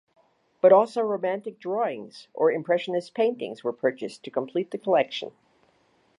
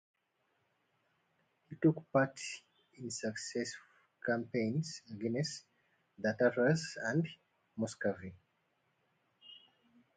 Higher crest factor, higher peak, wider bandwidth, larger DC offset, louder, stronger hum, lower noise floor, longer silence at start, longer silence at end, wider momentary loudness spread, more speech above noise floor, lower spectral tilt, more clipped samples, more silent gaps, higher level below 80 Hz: about the same, 20 dB vs 22 dB; first, -6 dBFS vs -16 dBFS; first, 10.5 kHz vs 9.4 kHz; neither; first, -25 LUFS vs -36 LUFS; neither; second, -65 dBFS vs -80 dBFS; second, 0.65 s vs 1.7 s; first, 0.9 s vs 0.6 s; second, 14 LU vs 19 LU; second, 40 dB vs 44 dB; about the same, -6 dB/octave vs -5.5 dB/octave; neither; neither; second, -82 dBFS vs -74 dBFS